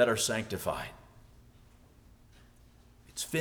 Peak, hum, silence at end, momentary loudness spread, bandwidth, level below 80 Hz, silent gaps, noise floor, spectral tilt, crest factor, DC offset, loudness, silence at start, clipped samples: -12 dBFS; none; 0 s; 16 LU; over 20 kHz; -58 dBFS; none; -59 dBFS; -3 dB/octave; 22 dB; under 0.1%; -33 LUFS; 0 s; under 0.1%